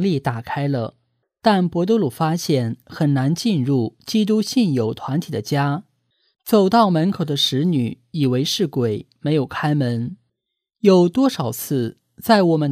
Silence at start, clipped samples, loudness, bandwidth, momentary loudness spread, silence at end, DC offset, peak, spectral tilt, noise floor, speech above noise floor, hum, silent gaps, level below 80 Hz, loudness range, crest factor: 0 s; under 0.1%; -20 LUFS; 15.5 kHz; 10 LU; 0 s; under 0.1%; -2 dBFS; -6 dB/octave; -80 dBFS; 61 dB; none; none; -60 dBFS; 2 LU; 18 dB